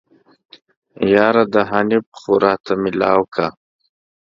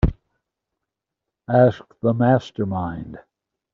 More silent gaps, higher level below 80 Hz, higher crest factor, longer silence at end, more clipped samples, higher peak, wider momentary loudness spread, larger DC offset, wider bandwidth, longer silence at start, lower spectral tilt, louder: first, 2.06-2.12 s vs none; second, -56 dBFS vs -34 dBFS; about the same, 18 dB vs 20 dB; first, 0.8 s vs 0.55 s; neither; first, 0 dBFS vs -4 dBFS; second, 8 LU vs 14 LU; neither; about the same, 7.4 kHz vs 7 kHz; first, 1 s vs 0.05 s; about the same, -7 dB/octave vs -7.5 dB/octave; first, -16 LUFS vs -20 LUFS